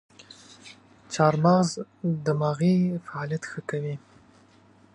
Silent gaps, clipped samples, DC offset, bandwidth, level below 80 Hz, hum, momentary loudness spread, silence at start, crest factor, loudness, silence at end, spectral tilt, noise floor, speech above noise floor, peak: none; under 0.1%; under 0.1%; 11 kHz; -68 dBFS; none; 22 LU; 0.65 s; 20 dB; -25 LUFS; 0.95 s; -6.5 dB/octave; -57 dBFS; 32 dB; -6 dBFS